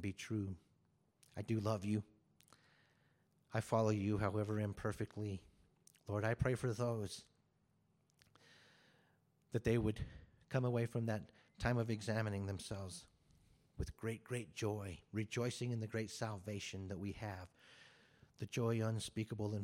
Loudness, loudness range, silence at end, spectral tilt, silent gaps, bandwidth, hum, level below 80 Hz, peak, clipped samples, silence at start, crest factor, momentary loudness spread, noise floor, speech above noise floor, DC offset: -42 LUFS; 5 LU; 0 s; -6.5 dB/octave; none; 14.5 kHz; none; -62 dBFS; -22 dBFS; under 0.1%; 0 s; 20 dB; 14 LU; -78 dBFS; 37 dB; under 0.1%